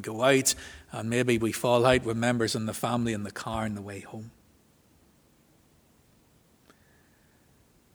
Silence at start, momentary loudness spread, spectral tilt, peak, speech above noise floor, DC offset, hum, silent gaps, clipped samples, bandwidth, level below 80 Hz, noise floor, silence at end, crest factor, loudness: 0 s; 18 LU; -4 dB/octave; -6 dBFS; 35 dB; under 0.1%; none; none; under 0.1%; over 20 kHz; -56 dBFS; -63 dBFS; 3.65 s; 24 dB; -27 LUFS